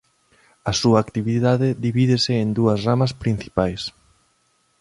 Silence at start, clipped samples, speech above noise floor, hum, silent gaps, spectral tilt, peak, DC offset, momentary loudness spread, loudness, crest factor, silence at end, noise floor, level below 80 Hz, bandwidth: 0.65 s; under 0.1%; 45 dB; none; none; -6 dB/octave; -2 dBFS; under 0.1%; 7 LU; -20 LUFS; 18 dB; 0.9 s; -64 dBFS; -46 dBFS; 11.5 kHz